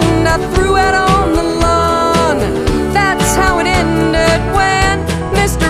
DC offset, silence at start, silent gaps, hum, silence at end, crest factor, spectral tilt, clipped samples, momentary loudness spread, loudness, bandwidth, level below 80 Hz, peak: under 0.1%; 0 s; none; none; 0 s; 12 dB; -5 dB/octave; under 0.1%; 3 LU; -12 LUFS; 15.5 kHz; -22 dBFS; 0 dBFS